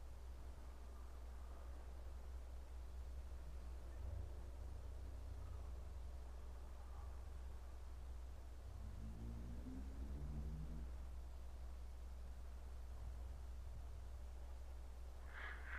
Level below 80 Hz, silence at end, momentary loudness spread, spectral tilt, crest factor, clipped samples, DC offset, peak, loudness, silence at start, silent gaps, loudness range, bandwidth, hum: -52 dBFS; 0 s; 5 LU; -6.5 dB/octave; 12 dB; under 0.1%; under 0.1%; -38 dBFS; -55 LUFS; 0 s; none; 3 LU; 14.5 kHz; none